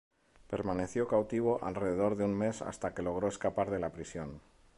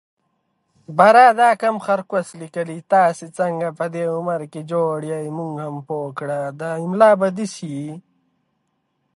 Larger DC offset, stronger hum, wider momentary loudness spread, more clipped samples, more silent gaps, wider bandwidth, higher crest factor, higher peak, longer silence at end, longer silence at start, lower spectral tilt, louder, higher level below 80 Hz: neither; neither; second, 11 LU vs 16 LU; neither; neither; about the same, 11.5 kHz vs 11.5 kHz; about the same, 16 dB vs 18 dB; second, -18 dBFS vs 0 dBFS; second, 0.4 s vs 1.2 s; second, 0.5 s vs 0.9 s; about the same, -6.5 dB/octave vs -6 dB/octave; second, -34 LUFS vs -19 LUFS; first, -58 dBFS vs -74 dBFS